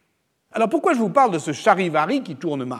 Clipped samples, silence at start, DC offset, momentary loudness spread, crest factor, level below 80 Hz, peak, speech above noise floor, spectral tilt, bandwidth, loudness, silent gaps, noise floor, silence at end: under 0.1%; 0.55 s; under 0.1%; 9 LU; 20 dB; -74 dBFS; -2 dBFS; 50 dB; -5.5 dB/octave; 13.5 kHz; -20 LUFS; none; -70 dBFS; 0 s